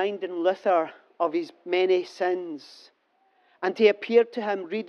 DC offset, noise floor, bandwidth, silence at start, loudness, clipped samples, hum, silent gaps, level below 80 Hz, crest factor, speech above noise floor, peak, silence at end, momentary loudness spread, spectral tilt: under 0.1%; -67 dBFS; 6.8 kHz; 0 s; -25 LUFS; under 0.1%; none; none; -90 dBFS; 18 dB; 42 dB; -6 dBFS; 0 s; 10 LU; -5.5 dB/octave